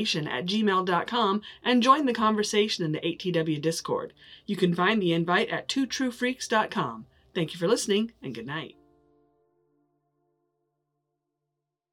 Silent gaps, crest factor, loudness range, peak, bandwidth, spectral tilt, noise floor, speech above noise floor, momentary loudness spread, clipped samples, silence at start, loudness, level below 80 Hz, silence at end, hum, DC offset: none; 22 dB; 8 LU; -6 dBFS; 16.5 kHz; -4.5 dB/octave; -84 dBFS; 58 dB; 12 LU; under 0.1%; 0 s; -26 LUFS; -68 dBFS; 3.25 s; none; under 0.1%